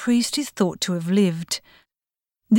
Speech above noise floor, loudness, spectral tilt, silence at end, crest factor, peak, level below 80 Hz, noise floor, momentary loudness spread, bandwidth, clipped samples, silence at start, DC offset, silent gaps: over 68 dB; -23 LUFS; -5 dB/octave; 0 s; 14 dB; -8 dBFS; -66 dBFS; under -90 dBFS; 8 LU; 17.5 kHz; under 0.1%; 0 s; under 0.1%; none